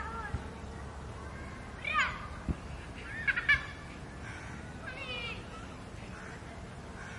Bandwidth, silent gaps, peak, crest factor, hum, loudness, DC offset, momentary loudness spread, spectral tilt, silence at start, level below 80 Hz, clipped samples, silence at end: 11.5 kHz; none; -14 dBFS; 24 dB; none; -37 LUFS; under 0.1%; 16 LU; -4.5 dB/octave; 0 s; -48 dBFS; under 0.1%; 0 s